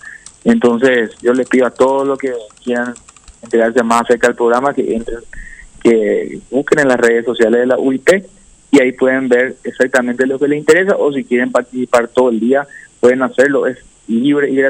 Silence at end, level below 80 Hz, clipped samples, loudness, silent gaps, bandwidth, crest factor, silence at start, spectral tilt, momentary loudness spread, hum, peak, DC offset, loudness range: 0 s; -44 dBFS; under 0.1%; -13 LUFS; none; 15.5 kHz; 14 dB; 0.05 s; -5 dB/octave; 9 LU; none; 0 dBFS; under 0.1%; 2 LU